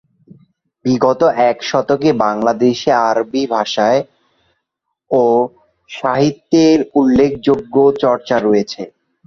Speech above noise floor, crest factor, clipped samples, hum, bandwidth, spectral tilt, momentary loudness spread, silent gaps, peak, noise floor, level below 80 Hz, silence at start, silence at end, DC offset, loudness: 61 dB; 14 dB; under 0.1%; none; 7.4 kHz; -6 dB/octave; 8 LU; none; -2 dBFS; -75 dBFS; -50 dBFS; 0.85 s; 0.4 s; under 0.1%; -14 LUFS